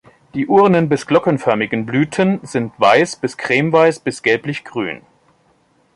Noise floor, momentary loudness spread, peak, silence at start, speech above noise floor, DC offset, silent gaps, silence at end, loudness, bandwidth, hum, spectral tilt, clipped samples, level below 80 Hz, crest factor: -57 dBFS; 12 LU; 0 dBFS; 0.35 s; 42 dB; under 0.1%; none; 1 s; -16 LUFS; 11.5 kHz; none; -6 dB/octave; under 0.1%; -58 dBFS; 16 dB